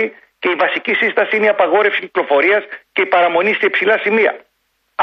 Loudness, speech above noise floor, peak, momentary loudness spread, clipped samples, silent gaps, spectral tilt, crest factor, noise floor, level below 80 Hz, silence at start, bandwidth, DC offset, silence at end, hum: -14 LUFS; 51 dB; -2 dBFS; 8 LU; under 0.1%; none; -6 dB/octave; 14 dB; -66 dBFS; -66 dBFS; 0 s; 6 kHz; under 0.1%; 0 s; none